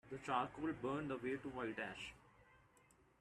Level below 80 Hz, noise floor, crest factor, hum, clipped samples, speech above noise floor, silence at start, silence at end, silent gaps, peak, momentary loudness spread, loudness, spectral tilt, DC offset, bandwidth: -72 dBFS; -72 dBFS; 20 dB; none; under 0.1%; 28 dB; 0.05 s; 0.65 s; none; -26 dBFS; 7 LU; -45 LUFS; -6 dB/octave; under 0.1%; 12.5 kHz